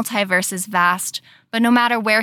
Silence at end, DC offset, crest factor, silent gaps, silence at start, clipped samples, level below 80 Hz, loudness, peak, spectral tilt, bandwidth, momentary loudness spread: 0 s; under 0.1%; 14 dB; none; 0 s; under 0.1%; -78 dBFS; -18 LUFS; -4 dBFS; -3 dB/octave; 19 kHz; 11 LU